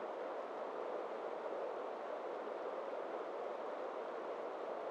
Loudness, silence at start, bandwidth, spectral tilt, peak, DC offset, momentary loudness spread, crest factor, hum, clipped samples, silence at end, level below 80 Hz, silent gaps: -44 LUFS; 0 s; 10 kHz; -4.5 dB/octave; -32 dBFS; under 0.1%; 1 LU; 12 dB; none; under 0.1%; 0 s; under -90 dBFS; none